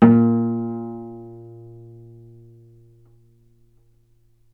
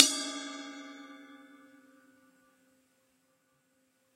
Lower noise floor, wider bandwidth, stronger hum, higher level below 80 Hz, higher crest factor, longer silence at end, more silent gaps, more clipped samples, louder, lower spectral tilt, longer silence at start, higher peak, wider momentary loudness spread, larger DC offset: second, -57 dBFS vs -73 dBFS; second, 3.2 kHz vs 16 kHz; neither; first, -60 dBFS vs under -90 dBFS; second, 22 dB vs 36 dB; first, 3 s vs 2.8 s; neither; neither; first, -20 LUFS vs -32 LUFS; first, -11.5 dB/octave vs 1.5 dB/octave; about the same, 0 s vs 0 s; about the same, 0 dBFS vs 0 dBFS; first, 28 LU vs 23 LU; neither